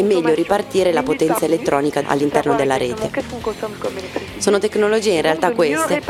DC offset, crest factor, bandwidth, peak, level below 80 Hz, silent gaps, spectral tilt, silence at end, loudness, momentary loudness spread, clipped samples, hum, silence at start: under 0.1%; 18 dB; 16 kHz; 0 dBFS; -48 dBFS; none; -4.5 dB/octave; 0 s; -18 LUFS; 9 LU; under 0.1%; none; 0 s